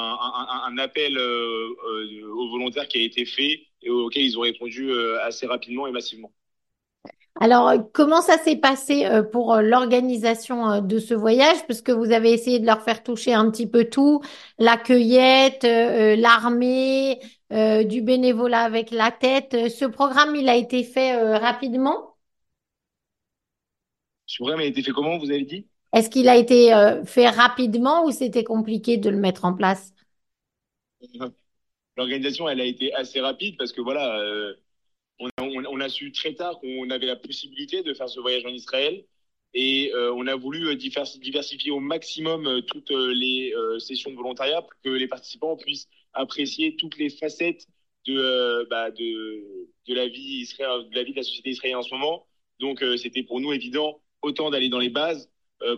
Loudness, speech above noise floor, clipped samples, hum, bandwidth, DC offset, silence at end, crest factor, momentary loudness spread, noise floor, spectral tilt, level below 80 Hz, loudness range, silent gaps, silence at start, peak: -21 LUFS; 64 dB; under 0.1%; none; 12.5 kHz; under 0.1%; 0 s; 22 dB; 15 LU; -85 dBFS; -4 dB/octave; -72 dBFS; 11 LU; 35.31-35.37 s; 0 s; 0 dBFS